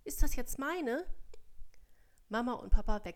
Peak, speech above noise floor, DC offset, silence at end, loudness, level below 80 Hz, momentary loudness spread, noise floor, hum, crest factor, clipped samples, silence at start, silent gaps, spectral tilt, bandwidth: -12 dBFS; 28 dB; under 0.1%; 0 s; -37 LUFS; -36 dBFS; 6 LU; -60 dBFS; none; 20 dB; under 0.1%; 0.05 s; none; -5 dB/octave; 16 kHz